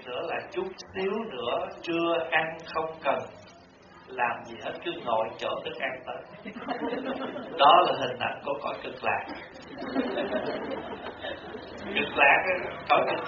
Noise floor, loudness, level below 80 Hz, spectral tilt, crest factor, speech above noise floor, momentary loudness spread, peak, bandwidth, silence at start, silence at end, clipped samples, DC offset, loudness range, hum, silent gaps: -52 dBFS; -28 LUFS; -64 dBFS; -1.5 dB/octave; 22 dB; 24 dB; 18 LU; -6 dBFS; 7 kHz; 0 s; 0 s; under 0.1%; under 0.1%; 7 LU; none; none